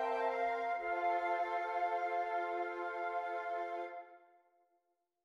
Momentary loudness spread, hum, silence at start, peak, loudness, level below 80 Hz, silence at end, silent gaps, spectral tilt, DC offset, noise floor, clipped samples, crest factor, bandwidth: 5 LU; none; 0 s; -24 dBFS; -38 LUFS; -78 dBFS; 1.05 s; none; -3.5 dB/octave; under 0.1%; -82 dBFS; under 0.1%; 14 dB; 7.4 kHz